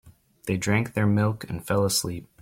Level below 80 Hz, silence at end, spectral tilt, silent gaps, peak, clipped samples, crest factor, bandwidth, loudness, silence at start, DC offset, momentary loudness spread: -54 dBFS; 0.2 s; -5 dB/octave; none; -10 dBFS; under 0.1%; 16 dB; 16.5 kHz; -25 LUFS; 0.05 s; under 0.1%; 11 LU